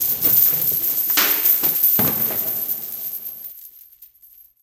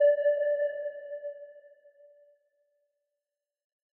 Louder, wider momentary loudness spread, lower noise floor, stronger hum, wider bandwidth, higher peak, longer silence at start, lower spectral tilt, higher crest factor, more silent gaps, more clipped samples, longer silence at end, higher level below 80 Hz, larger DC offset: first, -16 LUFS vs -30 LUFS; second, 15 LU vs 20 LU; second, -49 dBFS vs -90 dBFS; neither; first, 17 kHz vs 3.1 kHz; first, -2 dBFS vs -16 dBFS; about the same, 0 s vs 0 s; first, -2 dB/octave vs 1 dB/octave; about the same, 18 dB vs 18 dB; neither; neither; second, 0.6 s vs 2.4 s; first, -58 dBFS vs under -90 dBFS; neither